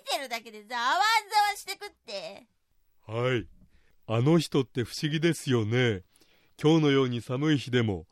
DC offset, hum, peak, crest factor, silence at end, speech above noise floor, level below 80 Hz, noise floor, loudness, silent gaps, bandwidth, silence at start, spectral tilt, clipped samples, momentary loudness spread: under 0.1%; none; -12 dBFS; 16 dB; 0.1 s; 39 dB; -64 dBFS; -66 dBFS; -27 LUFS; none; 15 kHz; 0.05 s; -5.5 dB/octave; under 0.1%; 14 LU